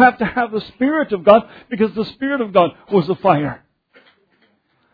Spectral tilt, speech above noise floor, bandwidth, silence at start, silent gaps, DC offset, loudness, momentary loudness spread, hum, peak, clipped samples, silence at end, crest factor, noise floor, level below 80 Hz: -9 dB/octave; 45 dB; 5 kHz; 0 s; none; under 0.1%; -17 LUFS; 10 LU; none; 0 dBFS; under 0.1%; 1.35 s; 18 dB; -61 dBFS; -52 dBFS